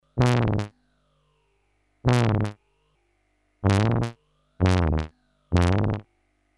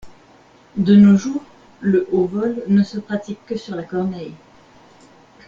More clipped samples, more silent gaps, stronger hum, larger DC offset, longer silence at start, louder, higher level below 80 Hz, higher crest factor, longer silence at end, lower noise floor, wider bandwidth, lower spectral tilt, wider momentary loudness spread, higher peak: neither; neither; first, 50 Hz at -45 dBFS vs none; neither; about the same, 0.15 s vs 0.05 s; second, -24 LUFS vs -18 LUFS; first, -38 dBFS vs -56 dBFS; about the same, 18 dB vs 16 dB; second, 0.55 s vs 1.1 s; first, -69 dBFS vs -49 dBFS; first, 11.5 kHz vs 7.2 kHz; about the same, -7 dB/octave vs -8 dB/octave; second, 11 LU vs 17 LU; second, -6 dBFS vs -2 dBFS